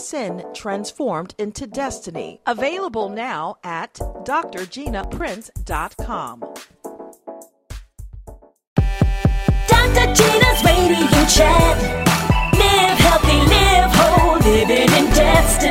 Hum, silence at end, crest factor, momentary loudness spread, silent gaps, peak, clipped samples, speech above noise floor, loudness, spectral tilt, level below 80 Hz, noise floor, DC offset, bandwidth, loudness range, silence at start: none; 0 s; 16 dB; 17 LU; 8.67-8.76 s; -2 dBFS; under 0.1%; 23 dB; -16 LUFS; -4 dB/octave; -24 dBFS; -41 dBFS; under 0.1%; 16.5 kHz; 15 LU; 0 s